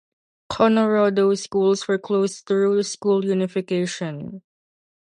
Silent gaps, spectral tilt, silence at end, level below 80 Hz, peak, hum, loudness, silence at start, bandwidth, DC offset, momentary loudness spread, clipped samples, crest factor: none; -5.5 dB/octave; 0.65 s; -60 dBFS; -6 dBFS; none; -21 LUFS; 0.5 s; 10.5 kHz; under 0.1%; 12 LU; under 0.1%; 16 dB